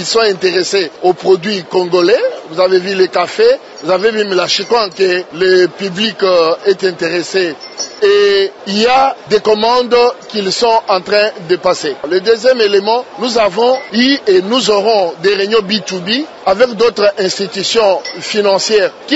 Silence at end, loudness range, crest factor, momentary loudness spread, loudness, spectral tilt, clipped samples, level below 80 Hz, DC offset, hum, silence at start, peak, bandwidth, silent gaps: 0 s; 1 LU; 12 dB; 6 LU; -12 LUFS; -3.5 dB/octave; under 0.1%; -54 dBFS; under 0.1%; none; 0 s; 0 dBFS; 8 kHz; none